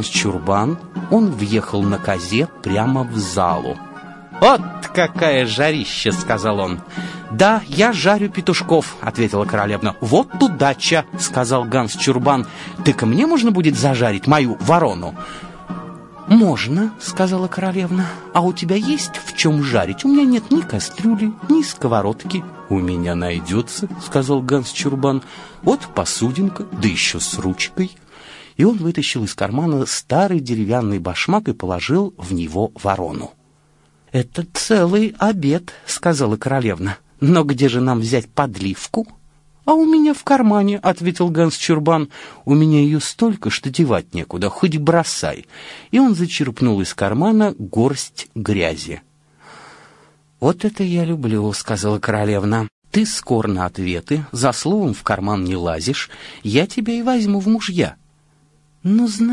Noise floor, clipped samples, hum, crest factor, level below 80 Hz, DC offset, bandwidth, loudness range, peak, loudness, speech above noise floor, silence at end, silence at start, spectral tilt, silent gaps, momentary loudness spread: -56 dBFS; under 0.1%; none; 16 dB; -50 dBFS; under 0.1%; 11.5 kHz; 4 LU; 0 dBFS; -18 LUFS; 38 dB; 0 s; 0 s; -5.5 dB/octave; 52.72-52.82 s; 10 LU